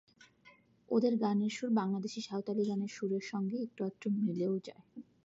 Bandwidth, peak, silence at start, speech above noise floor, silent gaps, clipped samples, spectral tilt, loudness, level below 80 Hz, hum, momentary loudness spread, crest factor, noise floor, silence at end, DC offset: 7.8 kHz; -18 dBFS; 0.45 s; 30 dB; none; under 0.1%; -6.5 dB/octave; -35 LUFS; -84 dBFS; none; 8 LU; 18 dB; -64 dBFS; 0.2 s; under 0.1%